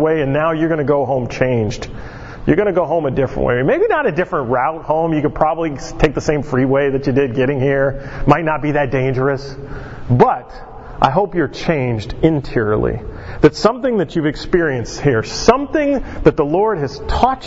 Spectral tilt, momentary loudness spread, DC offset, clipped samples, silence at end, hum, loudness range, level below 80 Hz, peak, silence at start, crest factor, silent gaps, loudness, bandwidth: -6.5 dB/octave; 8 LU; under 0.1%; under 0.1%; 0 s; none; 1 LU; -32 dBFS; 0 dBFS; 0 s; 16 dB; none; -16 LUFS; 8 kHz